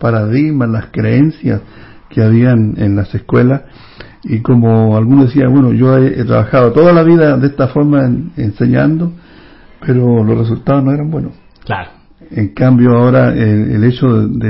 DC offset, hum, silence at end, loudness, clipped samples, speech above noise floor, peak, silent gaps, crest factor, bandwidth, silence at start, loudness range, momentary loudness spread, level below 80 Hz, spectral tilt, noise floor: under 0.1%; none; 0 s; -11 LUFS; under 0.1%; 28 dB; 0 dBFS; none; 10 dB; 5.8 kHz; 0 s; 5 LU; 11 LU; -36 dBFS; -12 dB/octave; -38 dBFS